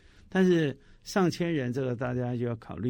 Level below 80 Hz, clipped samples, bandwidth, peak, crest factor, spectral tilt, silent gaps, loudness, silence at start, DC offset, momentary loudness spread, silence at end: -58 dBFS; under 0.1%; 16.5 kHz; -12 dBFS; 18 dB; -7 dB/octave; none; -29 LUFS; 0.3 s; under 0.1%; 8 LU; 0 s